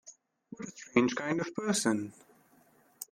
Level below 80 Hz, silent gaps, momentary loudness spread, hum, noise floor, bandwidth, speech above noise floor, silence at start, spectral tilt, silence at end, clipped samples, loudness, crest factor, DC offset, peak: -74 dBFS; none; 17 LU; none; -65 dBFS; 15.5 kHz; 33 dB; 0.05 s; -4 dB/octave; 0.05 s; under 0.1%; -31 LUFS; 24 dB; under 0.1%; -10 dBFS